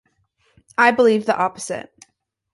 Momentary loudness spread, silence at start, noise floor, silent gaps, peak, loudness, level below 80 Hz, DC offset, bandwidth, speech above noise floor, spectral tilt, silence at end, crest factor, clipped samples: 15 LU; 0.8 s; -65 dBFS; none; -2 dBFS; -18 LUFS; -64 dBFS; under 0.1%; 11.5 kHz; 47 dB; -4 dB/octave; 0.7 s; 20 dB; under 0.1%